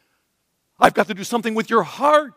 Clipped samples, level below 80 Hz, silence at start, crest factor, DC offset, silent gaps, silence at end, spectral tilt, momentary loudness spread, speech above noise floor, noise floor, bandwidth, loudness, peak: under 0.1%; -58 dBFS; 0.8 s; 20 dB; under 0.1%; none; 0.05 s; -4.5 dB/octave; 6 LU; 53 dB; -71 dBFS; 16 kHz; -19 LUFS; 0 dBFS